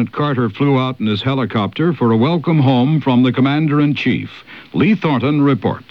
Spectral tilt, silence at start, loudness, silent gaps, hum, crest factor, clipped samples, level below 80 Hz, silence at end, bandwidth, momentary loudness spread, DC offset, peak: -9 dB/octave; 0 s; -15 LUFS; none; none; 14 dB; under 0.1%; -56 dBFS; 0.1 s; 6.2 kHz; 5 LU; 0.2%; -2 dBFS